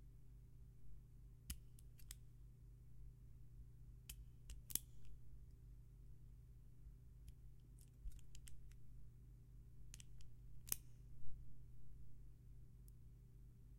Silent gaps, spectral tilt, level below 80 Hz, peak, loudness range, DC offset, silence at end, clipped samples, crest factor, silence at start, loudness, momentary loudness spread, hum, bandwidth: none; -3 dB/octave; -62 dBFS; -18 dBFS; 8 LU; under 0.1%; 0 s; under 0.1%; 36 dB; 0 s; -58 LUFS; 17 LU; none; 16 kHz